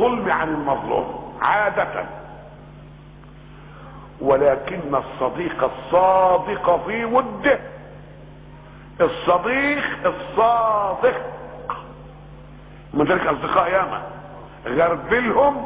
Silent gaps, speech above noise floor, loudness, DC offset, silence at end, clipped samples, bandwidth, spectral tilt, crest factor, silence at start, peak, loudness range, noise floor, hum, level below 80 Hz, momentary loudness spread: none; 23 dB; -20 LUFS; under 0.1%; 0 s; under 0.1%; 4 kHz; -9.5 dB/octave; 16 dB; 0 s; -4 dBFS; 5 LU; -42 dBFS; none; -46 dBFS; 21 LU